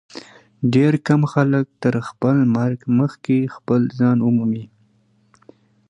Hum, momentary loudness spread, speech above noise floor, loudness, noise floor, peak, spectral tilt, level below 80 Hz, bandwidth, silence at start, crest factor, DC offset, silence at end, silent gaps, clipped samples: none; 7 LU; 42 dB; -19 LUFS; -59 dBFS; -2 dBFS; -8.5 dB/octave; -60 dBFS; 9.2 kHz; 0.15 s; 18 dB; under 0.1%; 1.25 s; none; under 0.1%